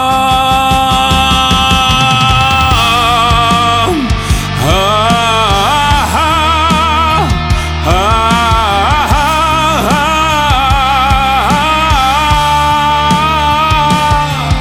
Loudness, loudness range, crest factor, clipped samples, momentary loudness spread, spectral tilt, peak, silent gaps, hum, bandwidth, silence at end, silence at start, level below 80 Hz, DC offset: -9 LUFS; 2 LU; 10 dB; under 0.1%; 3 LU; -4 dB/octave; 0 dBFS; none; none; over 20 kHz; 0 s; 0 s; -20 dBFS; under 0.1%